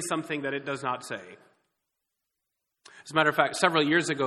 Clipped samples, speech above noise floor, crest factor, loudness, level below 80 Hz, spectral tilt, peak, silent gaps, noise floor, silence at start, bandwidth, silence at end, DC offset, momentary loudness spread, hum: under 0.1%; 56 dB; 26 dB; -26 LUFS; -74 dBFS; -3.5 dB/octave; -4 dBFS; none; -83 dBFS; 0 s; 14.5 kHz; 0 s; under 0.1%; 11 LU; none